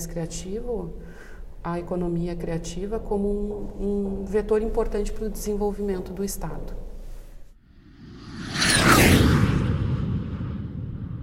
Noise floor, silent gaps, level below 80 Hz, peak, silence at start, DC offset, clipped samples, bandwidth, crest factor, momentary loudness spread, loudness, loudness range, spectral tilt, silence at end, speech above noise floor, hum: -50 dBFS; none; -34 dBFS; -4 dBFS; 0 s; under 0.1%; under 0.1%; 16 kHz; 22 dB; 20 LU; -25 LUFS; 10 LU; -5 dB/octave; 0 s; 23 dB; none